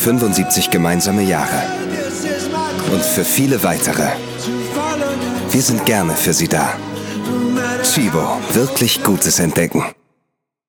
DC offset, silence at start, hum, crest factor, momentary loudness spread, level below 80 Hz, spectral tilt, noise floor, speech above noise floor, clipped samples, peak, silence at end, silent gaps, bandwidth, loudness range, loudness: under 0.1%; 0 s; none; 16 dB; 7 LU; -48 dBFS; -3.5 dB/octave; -72 dBFS; 57 dB; under 0.1%; 0 dBFS; 0.75 s; none; over 20 kHz; 1 LU; -16 LUFS